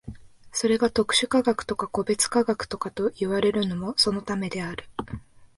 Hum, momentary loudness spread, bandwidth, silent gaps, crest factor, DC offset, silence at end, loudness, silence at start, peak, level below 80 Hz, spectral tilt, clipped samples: none; 14 LU; 11.5 kHz; none; 18 dB; under 0.1%; 0.15 s; -25 LUFS; 0.05 s; -8 dBFS; -52 dBFS; -3.5 dB/octave; under 0.1%